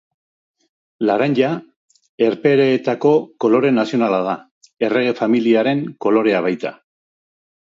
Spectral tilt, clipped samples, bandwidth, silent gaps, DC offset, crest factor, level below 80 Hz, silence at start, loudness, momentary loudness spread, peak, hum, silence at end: -7.5 dB/octave; under 0.1%; 7.6 kHz; 1.76-1.88 s, 2.09-2.18 s, 4.51-4.61 s; under 0.1%; 16 dB; -68 dBFS; 1 s; -17 LUFS; 8 LU; -2 dBFS; none; 0.95 s